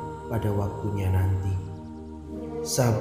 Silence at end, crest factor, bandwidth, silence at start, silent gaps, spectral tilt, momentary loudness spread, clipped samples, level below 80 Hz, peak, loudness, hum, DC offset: 0 s; 18 dB; 15.5 kHz; 0 s; none; -6 dB/octave; 14 LU; under 0.1%; -46 dBFS; -10 dBFS; -28 LUFS; none; under 0.1%